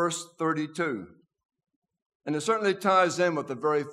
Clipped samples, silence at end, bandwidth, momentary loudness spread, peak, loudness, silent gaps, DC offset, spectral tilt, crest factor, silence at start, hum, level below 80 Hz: under 0.1%; 0 s; 14.5 kHz; 10 LU; -10 dBFS; -27 LUFS; 1.45-1.49 s, 1.76-1.82 s, 2.02-2.20 s; under 0.1%; -4.5 dB/octave; 20 dB; 0 s; none; -80 dBFS